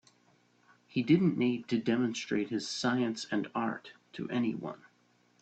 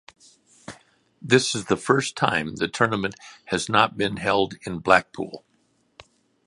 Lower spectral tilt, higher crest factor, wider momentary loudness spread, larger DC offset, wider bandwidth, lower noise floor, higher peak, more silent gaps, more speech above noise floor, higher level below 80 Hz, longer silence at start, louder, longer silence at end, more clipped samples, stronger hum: first, -5.5 dB/octave vs -4 dB/octave; about the same, 20 dB vs 24 dB; second, 16 LU vs 23 LU; neither; second, 8.8 kHz vs 11.5 kHz; about the same, -69 dBFS vs -66 dBFS; second, -14 dBFS vs 0 dBFS; neither; second, 37 dB vs 43 dB; second, -74 dBFS vs -56 dBFS; first, 0.95 s vs 0.7 s; second, -32 LUFS vs -22 LUFS; second, 0.65 s vs 1.1 s; neither; first, 60 Hz at -55 dBFS vs none